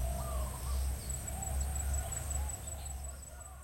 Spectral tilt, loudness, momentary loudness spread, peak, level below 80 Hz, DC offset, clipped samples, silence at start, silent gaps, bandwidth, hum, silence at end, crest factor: -4 dB/octave; -39 LUFS; 7 LU; -24 dBFS; -40 dBFS; under 0.1%; under 0.1%; 0 s; none; 16.5 kHz; none; 0 s; 14 dB